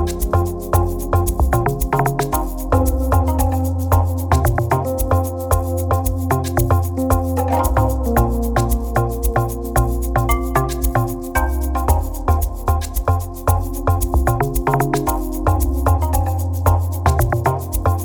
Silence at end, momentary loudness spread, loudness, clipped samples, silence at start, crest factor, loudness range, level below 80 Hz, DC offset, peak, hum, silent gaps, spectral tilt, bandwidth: 0 s; 3 LU; -19 LUFS; under 0.1%; 0 s; 14 dB; 1 LU; -22 dBFS; 0.2%; -2 dBFS; none; none; -6.5 dB/octave; over 20 kHz